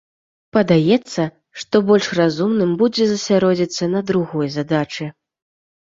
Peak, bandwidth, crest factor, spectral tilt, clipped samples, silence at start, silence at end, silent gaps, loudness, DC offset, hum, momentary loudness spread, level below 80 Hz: -2 dBFS; 7.8 kHz; 16 dB; -6 dB/octave; under 0.1%; 0.55 s; 0.85 s; none; -18 LUFS; under 0.1%; none; 9 LU; -56 dBFS